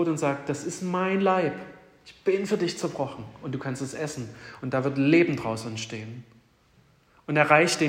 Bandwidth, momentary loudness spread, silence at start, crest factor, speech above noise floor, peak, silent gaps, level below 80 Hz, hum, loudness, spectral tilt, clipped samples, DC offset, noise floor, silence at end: 16 kHz; 18 LU; 0 s; 22 dB; 35 dB; -4 dBFS; none; -66 dBFS; none; -26 LUFS; -5 dB/octave; under 0.1%; under 0.1%; -61 dBFS; 0 s